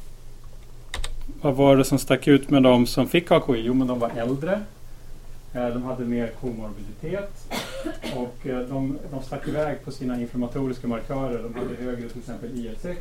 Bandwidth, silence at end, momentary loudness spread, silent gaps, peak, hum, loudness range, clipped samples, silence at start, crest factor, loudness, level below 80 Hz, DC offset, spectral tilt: 16.5 kHz; 0 s; 17 LU; none; -2 dBFS; none; 11 LU; under 0.1%; 0 s; 22 dB; -24 LUFS; -38 dBFS; under 0.1%; -6 dB/octave